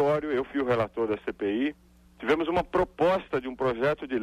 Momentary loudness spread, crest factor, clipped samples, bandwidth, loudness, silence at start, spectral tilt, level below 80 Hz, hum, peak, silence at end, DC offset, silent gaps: 5 LU; 14 dB; under 0.1%; 13 kHz; -28 LUFS; 0 s; -7 dB/octave; -52 dBFS; none; -14 dBFS; 0 s; under 0.1%; none